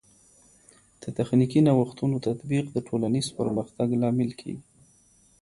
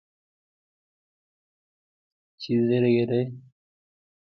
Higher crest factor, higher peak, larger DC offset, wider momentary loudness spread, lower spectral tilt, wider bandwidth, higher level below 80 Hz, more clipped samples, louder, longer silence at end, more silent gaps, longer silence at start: about the same, 18 dB vs 18 dB; about the same, -8 dBFS vs -10 dBFS; neither; first, 16 LU vs 12 LU; second, -7.5 dB/octave vs -9 dB/octave; first, 11.5 kHz vs 6.2 kHz; first, -60 dBFS vs -72 dBFS; neither; about the same, -26 LUFS vs -24 LUFS; second, 0.8 s vs 0.95 s; neither; second, 1 s vs 2.4 s